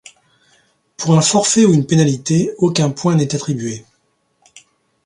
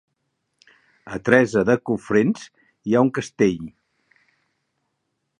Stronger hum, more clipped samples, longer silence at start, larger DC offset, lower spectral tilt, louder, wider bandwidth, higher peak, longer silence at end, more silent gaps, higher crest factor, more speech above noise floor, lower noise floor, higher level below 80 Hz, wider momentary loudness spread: neither; neither; about the same, 1 s vs 1.05 s; neither; second, -5 dB/octave vs -6.5 dB/octave; first, -15 LUFS vs -20 LUFS; about the same, 11.5 kHz vs 10.5 kHz; about the same, 0 dBFS vs 0 dBFS; second, 1.25 s vs 1.7 s; neither; second, 16 dB vs 22 dB; second, 49 dB vs 56 dB; second, -64 dBFS vs -76 dBFS; about the same, -56 dBFS vs -58 dBFS; second, 11 LU vs 16 LU